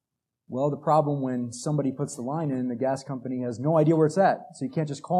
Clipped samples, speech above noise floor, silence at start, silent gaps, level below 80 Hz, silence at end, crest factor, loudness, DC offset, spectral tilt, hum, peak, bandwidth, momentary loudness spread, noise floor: under 0.1%; 40 dB; 0.5 s; none; -76 dBFS; 0 s; 18 dB; -26 LUFS; under 0.1%; -7.5 dB/octave; none; -8 dBFS; 11.5 kHz; 10 LU; -65 dBFS